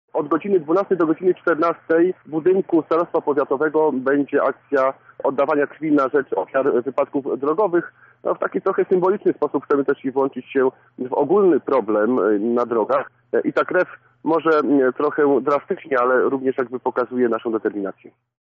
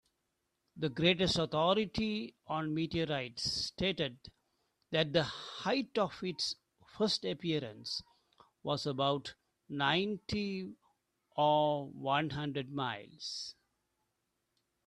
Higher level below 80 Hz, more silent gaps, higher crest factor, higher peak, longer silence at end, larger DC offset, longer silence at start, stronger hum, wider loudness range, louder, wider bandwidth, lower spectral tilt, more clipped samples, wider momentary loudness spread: second, -72 dBFS vs -64 dBFS; neither; second, 12 dB vs 22 dB; first, -8 dBFS vs -14 dBFS; second, 0.3 s vs 1.35 s; neither; second, 0.15 s vs 0.75 s; neither; about the same, 2 LU vs 3 LU; first, -20 LUFS vs -35 LUFS; second, 5.8 kHz vs 12 kHz; about the same, -6 dB/octave vs -5 dB/octave; neither; second, 6 LU vs 11 LU